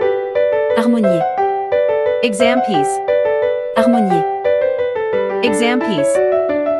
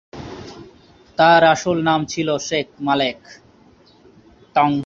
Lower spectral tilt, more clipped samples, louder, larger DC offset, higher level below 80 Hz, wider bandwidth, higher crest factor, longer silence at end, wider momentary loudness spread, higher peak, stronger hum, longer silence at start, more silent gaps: about the same, -5 dB/octave vs -4.5 dB/octave; neither; about the same, -15 LUFS vs -17 LUFS; neither; about the same, -58 dBFS vs -54 dBFS; first, 12 kHz vs 7.6 kHz; about the same, 14 dB vs 18 dB; about the same, 0 s vs 0 s; second, 3 LU vs 22 LU; about the same, 0 dBFS vs -2 dBFS; neither; second, 0 s vs 0.15 s; neither